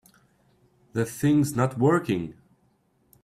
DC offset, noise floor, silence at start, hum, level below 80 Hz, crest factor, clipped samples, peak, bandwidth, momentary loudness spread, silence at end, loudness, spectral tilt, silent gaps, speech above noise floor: under 0.1%; -66 dBFS; 0.95 s; none; -60 dBFS; 18 dB; under 0.1%; -10 dBFS; 15.5 kHz; 10 LU; 0.9 s; -25 LUFS; -7 dB/octave; none; 43 dB